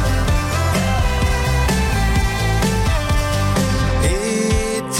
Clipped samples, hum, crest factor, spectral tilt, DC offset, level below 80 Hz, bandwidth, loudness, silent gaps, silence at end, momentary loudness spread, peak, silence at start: under 0.1%; none; 10 dB; -5 dB/octave; under 0.1%; -22 dBFS; 16.5 kHz; -18 LUFS; none; 0 s; 1 LU; -8 dBFS; 0 s